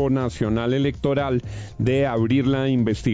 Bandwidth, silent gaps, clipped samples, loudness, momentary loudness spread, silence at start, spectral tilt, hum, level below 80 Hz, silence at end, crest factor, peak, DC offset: 7.8 kHz; none; under 0.1%; -22 LUFS; 5 LU; 0 s; -7.5 dB/octave; none; -40 dBFS; 0 s; 14 dB; -8 dBFS; under 0.1%